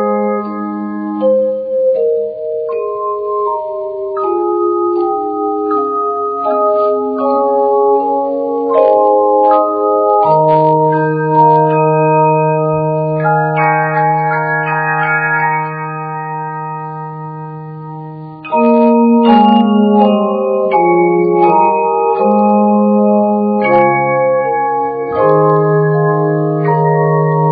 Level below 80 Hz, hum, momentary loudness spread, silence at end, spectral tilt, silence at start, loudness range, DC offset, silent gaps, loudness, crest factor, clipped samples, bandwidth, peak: -56 dBFS; none; 11 LU; 0 s; -6.5 dB/octave; 0 s; 6 LU; under 0.1%; none; -12 LUFS; 12 dB; under 0.1%; 4.9 kHz; 0 dBFS